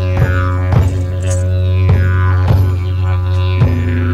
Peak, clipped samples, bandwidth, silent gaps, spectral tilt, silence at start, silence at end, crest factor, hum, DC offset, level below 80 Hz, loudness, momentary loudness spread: -2 dBFS; under 0.1%; 9.2 kHz; none; -7.5 dB/octave; 0 s; 0 s; 10 dB; none; under 0.1%; -24 dBFS; -14 LUFS; 4 LU